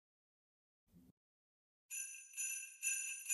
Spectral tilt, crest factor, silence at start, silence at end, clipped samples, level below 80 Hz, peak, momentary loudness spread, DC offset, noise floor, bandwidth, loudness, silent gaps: 3 dB/octave; 24 dB; 0.95 s; 0 s; under 0.1%; under -90 dBFS; -24 dBFS; 8 LU; under 0.1%; under -90 dBFS; 15 kHz; -42 LUFS; 1.11-1.89 s